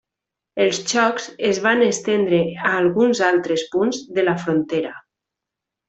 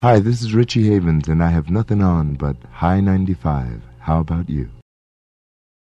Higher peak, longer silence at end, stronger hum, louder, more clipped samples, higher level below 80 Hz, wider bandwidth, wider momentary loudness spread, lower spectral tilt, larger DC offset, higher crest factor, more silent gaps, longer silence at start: about the same, -2 dBFS vs 0 dBFS; second, 0.9 s vs 1.05 s; neither; about the same, -19 LUFS vs -18 LUFS; neither; second, -62 dBFS vs -32 dBFS; about the same, 8.4 kHz vs 8.6 kHz; second, 6 LU vs 10 LU; second, -4 dB/octave vs -8 dB/octave; neither; about the same, 18 dB vs 18 dB; neither; first, 0.55 s vs 0 s